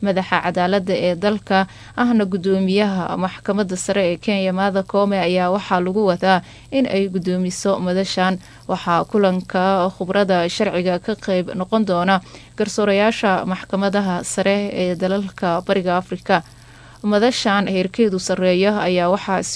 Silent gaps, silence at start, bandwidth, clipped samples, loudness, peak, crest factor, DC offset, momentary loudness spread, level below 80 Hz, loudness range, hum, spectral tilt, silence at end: none; 0 s; 11 kHz; under 0.1%; -19 LUFS; 0 dBFS; 18 dB; under 0.1%; 5 LU; -52 dBFS; 1 LU; none; -5.5 dB/octave; 0 s